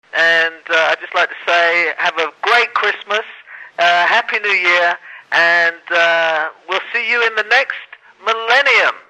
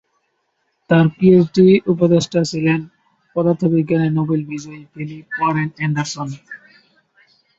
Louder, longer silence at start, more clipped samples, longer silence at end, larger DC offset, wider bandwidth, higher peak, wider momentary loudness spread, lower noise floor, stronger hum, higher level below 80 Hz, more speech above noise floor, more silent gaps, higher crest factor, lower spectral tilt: about the same, -14 LUFS vs -16 LUFS; second, 0.15 s vs 0.9 s; neither; second, 0.1 s vs 1.05 s; neither; first, 11.5 kHz vs 8 kHz; about the same, -2 dBFS vs 0 dBFS; second, 9 LU vs 18 LU; second, -36 dBFS vs -68 dBFS; neither; second, -80 dBFS vs -56 dBFS; second, 21 dB vs 52 dB; neither; about the same, 14 dB vs 18 dB; second, -1 dB/octave vs -7 dB/octave